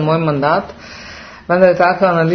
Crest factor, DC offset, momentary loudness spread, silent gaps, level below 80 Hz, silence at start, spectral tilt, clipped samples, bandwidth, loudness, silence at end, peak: 14 dB; under 0.1%; 21 LU; none; -48 dBFS; 0 s; -7.5 dB/octave; under 0.1%; 6.4 kHz; -13 LUFS; 0 s; 0 dBFS